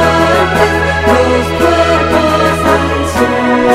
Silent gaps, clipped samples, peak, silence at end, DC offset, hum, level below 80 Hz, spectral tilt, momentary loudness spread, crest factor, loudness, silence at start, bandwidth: none; 0.1%; 0 dBFS; 0 s; under 0.1%; none; -26 dBFS; -5.5 dB/octave; 2 LU; 10 dB; -10 LUFS; 0 s; 16 kHz